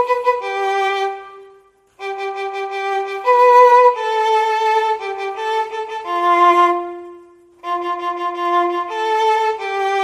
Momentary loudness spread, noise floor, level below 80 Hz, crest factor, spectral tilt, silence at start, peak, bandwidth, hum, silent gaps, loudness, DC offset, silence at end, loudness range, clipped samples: 14 LU; -50 dBFS; -68 dBFS; 16 dB; -2 dB/octave; 0 s; 0 dBFS; 14 kHz; none; none; -16 LUFS; under 0.1%; 0 s; 6 LU; under 0.1%